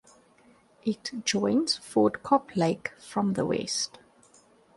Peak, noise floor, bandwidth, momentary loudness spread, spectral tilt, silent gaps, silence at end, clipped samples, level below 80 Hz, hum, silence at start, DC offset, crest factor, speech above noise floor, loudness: -8 dBFS; -60 dBFS; 11.5 kHz; 9 LU; -4.5 dB/octave; none; 0.9 s; under 0.1%; -66 dBFS; none; 0.85 s; under 0.1%; 22 dB; 33 dB; -28 LUFS